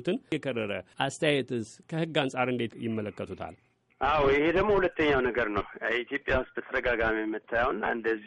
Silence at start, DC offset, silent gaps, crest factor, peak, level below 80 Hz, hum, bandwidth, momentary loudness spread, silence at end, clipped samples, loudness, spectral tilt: 0 s; under 0.1%; none; 18 dB; -10 dBFS; -48 dBFS; none; 11 kHz; 10 LU; 0 s; under 0.1%; -29 LUFS; -5.5 dB/octave